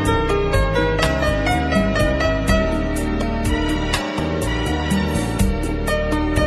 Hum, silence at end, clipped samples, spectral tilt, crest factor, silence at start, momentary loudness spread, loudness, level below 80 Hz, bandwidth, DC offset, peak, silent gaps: none; 0 s; under 0.1%; -5.5 dB/octave; 14 dB; 0 s; 4 LU; -20 LUFS; -24 dBFS; 15 kHz; under 0.1%; -4 dBFS; none